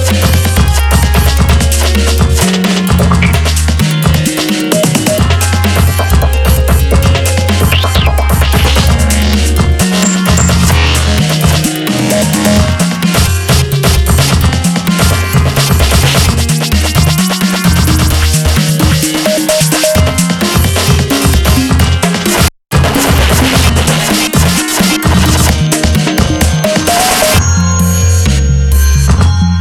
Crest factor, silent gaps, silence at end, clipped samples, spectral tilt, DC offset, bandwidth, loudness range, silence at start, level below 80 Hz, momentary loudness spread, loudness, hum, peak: 8 dB; none; 0 s; under 0.1%; -4.5 dB/octave; under 0.1%; 18 kHz; 1 LU; 0 s; -14 dBFS; 2 LU; -9 LUFS; none; 0 dBFS